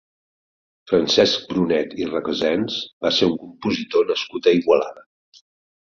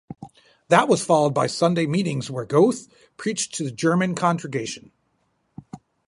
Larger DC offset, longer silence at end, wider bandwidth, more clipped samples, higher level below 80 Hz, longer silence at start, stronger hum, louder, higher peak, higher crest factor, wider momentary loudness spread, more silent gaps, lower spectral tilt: neither; first, 0.95 s vs 0.3 s; second, 7.4 kHz vs 11.5 kHz; neither; first, -56 dBFS vs -64 dBFS; first, 0.85 s vs 0.1 s; neither; about the same, -20 LUFS vs -22 LUFS; about the same, -2 dBFS vs -2 dBFS; about the same, 20 dB vs 22 dB; second, 9 LU vs 17 LU; first, 2.93-3.01 s vs none; about the same, -4.5 dB/octave vs -5 dB/octave